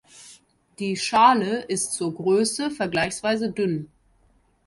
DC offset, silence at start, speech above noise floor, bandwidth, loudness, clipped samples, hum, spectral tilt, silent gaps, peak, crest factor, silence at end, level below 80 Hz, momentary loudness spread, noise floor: under 0.1%; 0.15 s; 39 dB; 12 kHz; -23 LUFS; under 0.1%; none; -4 dB/octave; none; -4 dBFS; 20 dB; 0.8 s; -60 dBFS; 10 LU; -62 dBFS